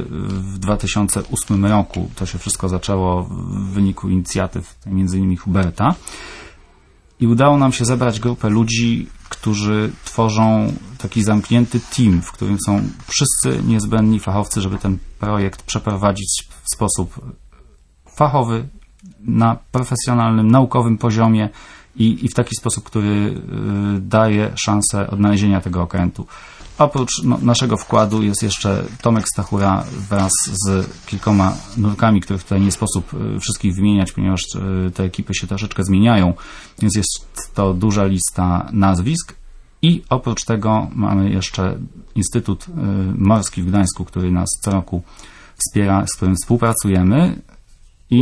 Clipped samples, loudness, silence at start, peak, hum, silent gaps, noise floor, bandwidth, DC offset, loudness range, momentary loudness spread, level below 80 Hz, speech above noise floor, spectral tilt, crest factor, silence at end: under 0.1%; -17 LUFS; 0 s; 0 dBFS; none; none; -50 dBFS; 11 kHz; under 0.1%; 3 LU; 9 LU; -36 dBFS; 33 dB; -5.5 dB/octave; 16 dB; 0 s